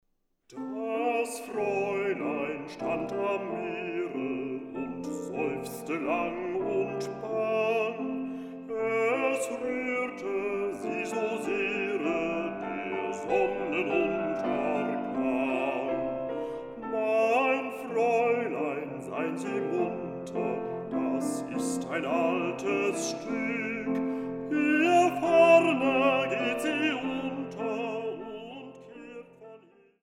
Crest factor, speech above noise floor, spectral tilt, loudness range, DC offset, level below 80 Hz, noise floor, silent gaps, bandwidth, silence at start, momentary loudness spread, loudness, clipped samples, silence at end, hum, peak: 20 dB; 33 dB; -5 dB/octave; 8 LU; under 0.1%; -66 dBFS; -63 dBFS; none; 16 kHz; 0.5 s; 11 LU; -29 LUFS; under 0.1%; 0.45 s; none; -10 dBFS